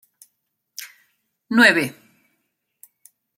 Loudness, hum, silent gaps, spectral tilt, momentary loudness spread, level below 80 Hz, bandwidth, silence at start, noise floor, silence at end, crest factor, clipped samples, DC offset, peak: -16 LUFS; none; none; -3.5 dB/octave; 25 LU; -72 dBFS; 16.5 kHz; 0.8 s; -74 dBFS; 1.45 s; 22 dB; under 0.1%; under 0.1%; -2 dBFS